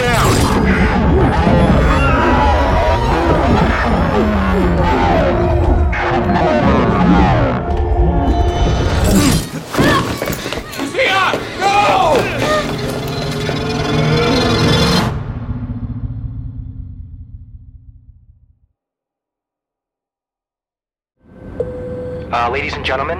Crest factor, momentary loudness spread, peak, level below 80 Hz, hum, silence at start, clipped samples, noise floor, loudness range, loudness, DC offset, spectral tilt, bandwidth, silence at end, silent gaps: 12 dB; 12 LU; -2 dBFS; -22 dBFS; none; 0 s; under 0.1%; under -90 dBFS; 15 LU; -14 LUFS; under 0.1%; -5.5 dB/octave; 16.5 kHz; 0 s; none